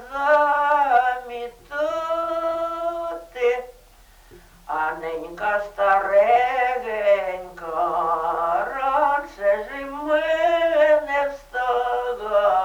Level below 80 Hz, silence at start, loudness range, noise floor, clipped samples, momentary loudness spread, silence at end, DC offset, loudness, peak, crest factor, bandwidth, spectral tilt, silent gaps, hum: -52 dBFS; 0 s; 6 LU; -50 dBFS; under 0.1%; 12 LU; 0 s; under 0.1%; -22 LUFS; -6 dBFS; 16 dB; 19.5 kHz; -4 dB/octave; none; none